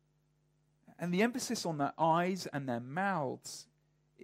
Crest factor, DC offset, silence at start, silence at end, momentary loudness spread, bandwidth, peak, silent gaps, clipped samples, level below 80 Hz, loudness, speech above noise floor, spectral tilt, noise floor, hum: 18 dB; under 0.1%; 0.9 s; 0 s; 13 LU; 16 kHz; -18 dBFS; none; under 0.1%; -80 dBFS; -34 LUFS; 40 dB; -5 dB/octave; -74 dBFS; none